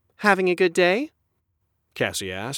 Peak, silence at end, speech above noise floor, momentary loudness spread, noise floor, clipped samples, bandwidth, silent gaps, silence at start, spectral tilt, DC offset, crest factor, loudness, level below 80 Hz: -4 dBFS; 0 s; 51 dB; 9 LU; -73 dBFS; under 0.1%; 17 kHz; none; 0.2 s; -4 dB/octave; under 0.1%; 20 dB; -22 LUFS; -64 dBFS